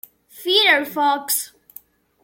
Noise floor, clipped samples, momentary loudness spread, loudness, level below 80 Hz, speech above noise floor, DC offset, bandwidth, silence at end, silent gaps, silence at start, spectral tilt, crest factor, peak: -47 dBFS; under 0.1%; 14 LU; -17 LUFS; -74 dBFS; 29 dB; under 0.1%; 17 kHz; 0.75 s; none; 0.35 s; 0 dB/octave; 18 dB; -2 dBFS